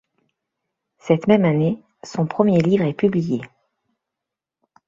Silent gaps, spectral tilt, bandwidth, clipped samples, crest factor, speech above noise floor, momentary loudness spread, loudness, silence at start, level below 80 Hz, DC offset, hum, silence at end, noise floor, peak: none; -8 dB/octave; 7.6 kHz; under 0.1%; 18 dB; 67 dB; 13 LU; -19 LUFS; 1.05 s; -58 dBFS; under 0.1%; none; 1.4 s; -85 dBFS; -2 dBFS